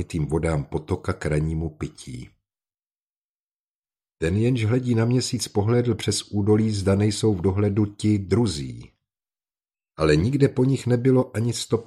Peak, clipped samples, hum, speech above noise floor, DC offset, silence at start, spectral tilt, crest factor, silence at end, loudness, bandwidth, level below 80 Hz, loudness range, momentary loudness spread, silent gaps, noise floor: -4 dBFS; under 0.1%; none; over 68 dB; under 0.1%; 0 s; -6.5 dB/octave; 18 dB; 0 s; -23 LUFS; 13 kHz; -44 dBFS; 9 LU; 9 LU; 3.00-3.82 s; under -90 dBFS